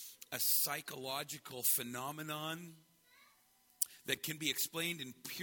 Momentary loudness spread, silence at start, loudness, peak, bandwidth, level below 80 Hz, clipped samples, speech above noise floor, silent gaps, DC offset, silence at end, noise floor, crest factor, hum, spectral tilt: 13 LU; 0 s; -37 LUFS; -16 dBFS; 17.5 kHz; -82 dBFS; under 0.1%; 31 dB; none; under 0.1%; 0 s; -71 dBFS; 24 dB; none; -1.5 dB/octave